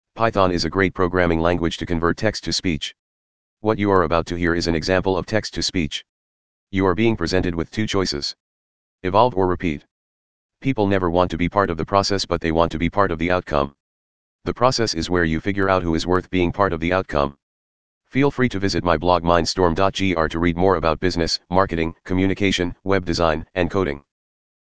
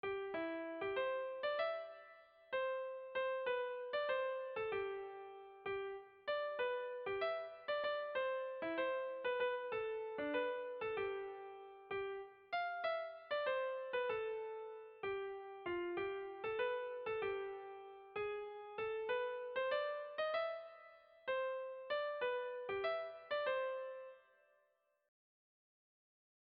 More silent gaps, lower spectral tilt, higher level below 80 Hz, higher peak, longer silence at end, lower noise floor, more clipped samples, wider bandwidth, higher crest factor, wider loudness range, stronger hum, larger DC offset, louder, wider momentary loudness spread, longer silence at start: first, 2.99-3.57 s, 6.09-6.67 s, 8.40-8.99 s, 9.91-10.49 s, 13.80-14.39 s, 17.43-18.01 s vs none; first, -5.5 dB/octave vs -0.5 dB/octave; first, -40 dBFS vs -80 dBFS; first, 0 dBFS vs -28 dBFS; second, 0.5 s vs 2.25 s; first, under -90 dBFS vs -80 dBFS; neither; first, 9.8 kHz vs 5.2 kHz; first, 20 dB vs 14 dB; about the same, 3 LU vs 2 LU; neither; first, 2% vs under 0.1%; first, -20 LUFS vs -42 LUFS; second, 7 LU vs 10 LU; about the same, 0 s vs 0.05 s